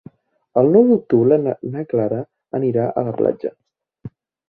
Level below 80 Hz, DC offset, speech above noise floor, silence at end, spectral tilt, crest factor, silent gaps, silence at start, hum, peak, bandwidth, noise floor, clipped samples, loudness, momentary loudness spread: -60 dBFS; under 0.1%; 29 dB; 0.4 s; -13 dB/octave; 16 dB; none; 0.55 s; none; -2 dBFS; 4.2 kHz; -46 dBFS; under 0.1%; -18 LUFS; 14 LU